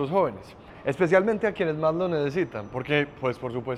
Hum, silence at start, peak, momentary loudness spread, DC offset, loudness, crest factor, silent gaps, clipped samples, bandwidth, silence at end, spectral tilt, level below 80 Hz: none; 0 s; -8 dBFS; 11 LU; under 0.1%; -26 LUFS; 18 dB; none; under 0.1%; 11.5 kHz; 0 s; -7 dB/octave; -56 dBFS